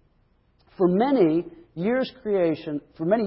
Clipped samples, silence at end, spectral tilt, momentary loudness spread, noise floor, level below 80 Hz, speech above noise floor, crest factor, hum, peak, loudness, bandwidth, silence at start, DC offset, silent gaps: under 0.1%; 0 s; -11.5 dB/octave; 10 LU; -63 dBFS; -60 dBFS; 41 dB; 16 dB; none; -8 dBFS; -24 LUFS; 5.8 kHz; 0.8 s; under 0.1%; none